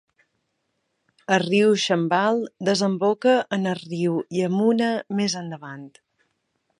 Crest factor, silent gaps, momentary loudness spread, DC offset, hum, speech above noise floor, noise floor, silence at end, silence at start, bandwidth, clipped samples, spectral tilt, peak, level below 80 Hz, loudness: 18 dB; none; 12 LU; under 0.1%; none; 53 dB; -74 dBFS; 0.9 s; 1.3 s; 11 kHz; under 0.1%; -5 dB/octave; -4 dBFS; -72 dBFS; -22 LUFS